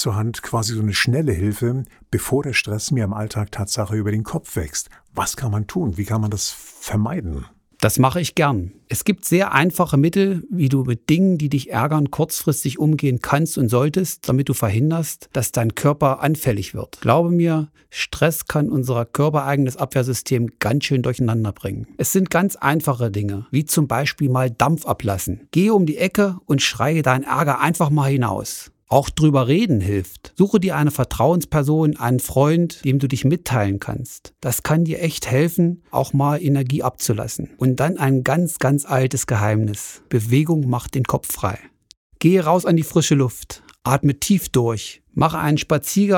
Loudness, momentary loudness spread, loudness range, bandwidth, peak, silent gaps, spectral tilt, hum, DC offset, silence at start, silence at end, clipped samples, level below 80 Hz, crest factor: -19 LUFS; 8 LU; 3 LU; 20 kHz; 0 dBFS; 41.97-42.10 s; -5.5 dB/octave; none; under 0.1%; 0 s; 0 s; under 0.1%; -44 dBFS; 20 dB